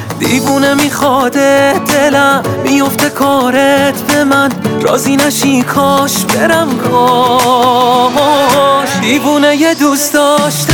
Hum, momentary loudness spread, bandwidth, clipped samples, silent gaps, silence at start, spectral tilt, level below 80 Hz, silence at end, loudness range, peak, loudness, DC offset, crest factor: none; 3 LU; over 20 kHz; under 0.1%; none; 0 s; -4 dB/octave; -48 dBFS; 0 s; 1 LU; 0 dBFS; -9 LUFS; under 0.1%; 10 dB